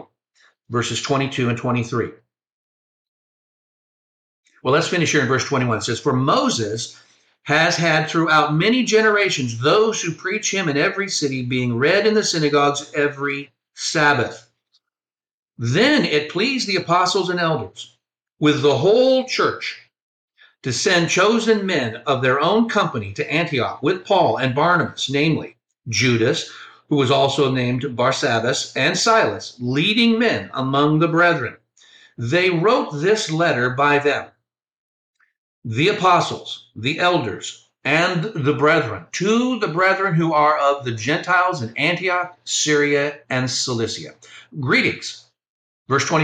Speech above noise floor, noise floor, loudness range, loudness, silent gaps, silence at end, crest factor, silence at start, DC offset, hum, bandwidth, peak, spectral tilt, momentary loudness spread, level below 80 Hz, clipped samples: over 71 dB; under -90 dBFS; 4 LU; -18 LUFS; 2.52-4.43 s, 15.31-15.46 s, 20.02-20.28 s, 34.73-35.14 s, 35.38-35.62 s, 45.49-45.86 s; 0 s; 16 dB; 0.7 s; under 0.1%; none; 9.8 kHz; -4 dBFS; -4.5 dB/octave; 10 LU; -60 dBFS; under 0.1%